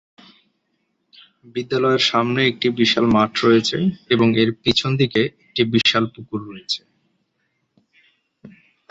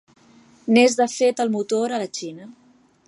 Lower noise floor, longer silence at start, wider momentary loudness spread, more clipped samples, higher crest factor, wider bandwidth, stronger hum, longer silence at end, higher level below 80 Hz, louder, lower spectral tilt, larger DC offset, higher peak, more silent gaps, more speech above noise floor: first, -71 dBFS vs -52 dBFS; first, 1.55 s vs 0.65 s; second, 10 LU vs 18 LU; neither; about the same, 18 dB vs 18 dB; second, 8 kHz vs 11.5 kHz; neither; about the same, 0.45 s vs 0.55 s; first, -54 dBFS vs -76 dBFS; about the same, -18 LUFS vs -20 LUFS; about the same, -5 dB/octave vs -4 dB/octave; neither; about the same, -2 dBFS vs -4 dBFS; neither; first, 52 dB vs 32 dB